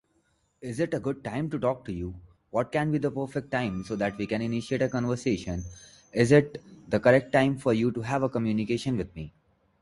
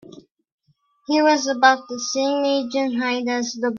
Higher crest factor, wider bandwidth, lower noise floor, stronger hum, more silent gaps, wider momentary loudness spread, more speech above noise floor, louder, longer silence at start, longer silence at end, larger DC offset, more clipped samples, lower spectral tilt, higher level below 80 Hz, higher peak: about the same, 22 dB vs 18 dB; first, 11.5 kHz vs 7.4 kHz; first, -70 dBFS vs -63 dBFS; neither; second, none vs 0.31-0.35 s, 0.52-0.58 s; first, 15 LU vs 7 LU; about the same, 43 dB vs 43 dB; second, -27 LUFS vs -20 LUFS; first, 0.6 s vs 0.05 s; first, 0.5 s vs 0 s; neither; neither; first, -7 dB/octave vs -2 dB/octave; first, -52 dBFS vs -70 dBFS; second, -6 dBFS vs -2 dBFS